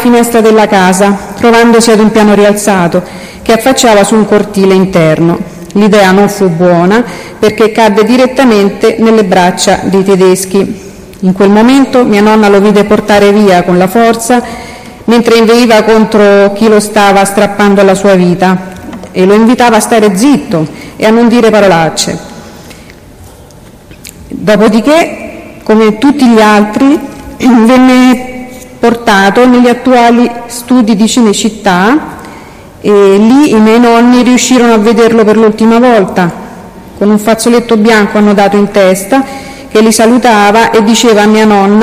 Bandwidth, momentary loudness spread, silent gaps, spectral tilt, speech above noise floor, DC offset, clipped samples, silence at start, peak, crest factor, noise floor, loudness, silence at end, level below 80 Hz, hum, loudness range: 15.5 kHz; 9 LU; none; -5 dB/octave; 27 dB; under 0.1%; 1%; 0 s; 0 dBFS; 6 dB; -32 dBFS; -6 LUFS; 0 s; -38 dBFS; none; 3 LU